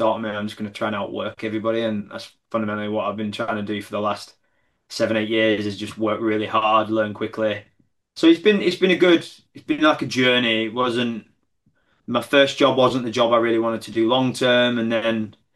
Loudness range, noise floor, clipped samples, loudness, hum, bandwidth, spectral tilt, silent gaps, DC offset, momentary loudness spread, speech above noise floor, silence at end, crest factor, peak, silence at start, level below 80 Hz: 7 LU; -68 dBFS; under 0.1%; -21 LUFS; none; 12.5 kHz; -5 dB/octave; none; under 0.1%; 11 LU; 48 dB; 0.25 s; 18 dB; -2 dBFS; 0 s; -66 dBFS